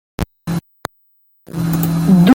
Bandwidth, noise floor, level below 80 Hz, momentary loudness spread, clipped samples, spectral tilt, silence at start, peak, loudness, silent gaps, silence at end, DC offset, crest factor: 17 kHz; -57 dBFS; -38 dBFS; 19 LU; under 0.1%; -7 dB/octave; 0.2 s; 0 dBFS; -18 LUFS; none; 0 s; under 0.1%; 16 dB